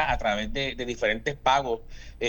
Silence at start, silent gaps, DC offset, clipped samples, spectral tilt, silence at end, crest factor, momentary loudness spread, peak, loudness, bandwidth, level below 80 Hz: 0 s; none; under 0.1%; under 0.1%; -4 dB/octave; 0 s; 18 dB; 7 LU; -10 dBFS; -27 LUFS; 19 kHz; -40 dBFS